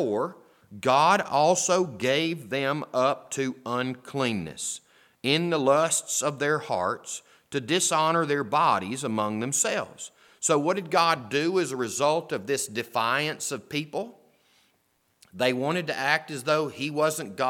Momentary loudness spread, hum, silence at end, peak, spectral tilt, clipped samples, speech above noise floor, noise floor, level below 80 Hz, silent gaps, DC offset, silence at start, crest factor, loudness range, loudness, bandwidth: 10 LU; none; 0 s; -6 dBFS; -3.5 dB/octave; under 0.1%; 44 dB; -70 dBFS; -72 dBFS; none; under 0.1%; 0 s; 20 dB; 5 LU; -26 LUFS; 17.5 kHz